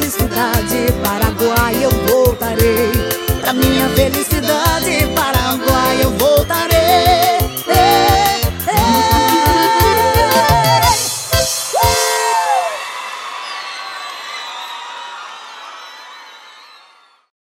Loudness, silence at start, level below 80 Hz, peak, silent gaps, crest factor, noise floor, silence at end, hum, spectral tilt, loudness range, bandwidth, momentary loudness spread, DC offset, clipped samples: -13 LUFS; 0 s; -28 dBFS; 0 dBFS; none; 14 dB; -48 dBFS; 0.9 s; none; -4 dB/octave; 14 LU; 17 kHz; 15 LU; under 0.1%; under 0.1%